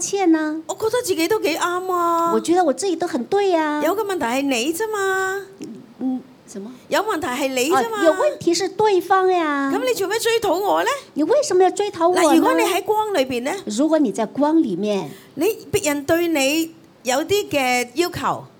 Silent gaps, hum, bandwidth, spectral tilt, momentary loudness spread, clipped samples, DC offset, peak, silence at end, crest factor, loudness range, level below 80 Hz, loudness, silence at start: none; none; 19 kHz; -3.5 dB/octave; 8 LU; under 0.1%; under 0.1%; -4 dBFS; 0.1 s; 16 dB; 4 LU; -58 dBFS; -19 LUFS; 0 s